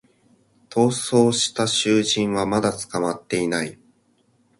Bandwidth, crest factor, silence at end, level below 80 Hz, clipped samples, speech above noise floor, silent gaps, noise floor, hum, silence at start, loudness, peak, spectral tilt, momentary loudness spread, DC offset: 11.5 kHz; 18 dB; 0.85 s; -58 dBFS; under 0.1%; 42 dB; none; -62 dBFS; none; 0.7 s; -21 LUFS; -4 dBFS; -4 dB/octave; 7 LU; under 0.1%